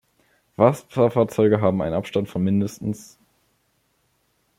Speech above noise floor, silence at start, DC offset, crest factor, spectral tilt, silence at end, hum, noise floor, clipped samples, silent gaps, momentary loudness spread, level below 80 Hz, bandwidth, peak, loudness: 47 dB; 0.6 s; under 0.1%; 20 dB; -7.5 dB/octave; 1.55 s; none; -68 dBFS; under 0.1%; none; 12 LU; -56 dBFS; 16 kHz; -2 dBFS; -21 LUFS